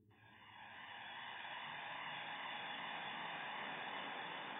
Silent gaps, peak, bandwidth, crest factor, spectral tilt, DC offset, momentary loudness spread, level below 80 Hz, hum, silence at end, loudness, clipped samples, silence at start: none; -34 dBFS; 3.8 kHz; 14 dB; 2 dB/octave; under 0.1%; 10 LU; under -90 dBFS; none; 0 s; -47 LUFS; under 0.1%; 0 s